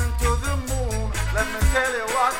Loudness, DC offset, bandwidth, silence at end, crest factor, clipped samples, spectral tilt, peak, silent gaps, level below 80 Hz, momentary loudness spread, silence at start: -23 LUFS; under 0.1%; 16.5 kHz; 0 s; 14 dB; under 0.1%; -4 dB/octave; -8 dBFS; none; -26 dBFS; 5 LU; 0 s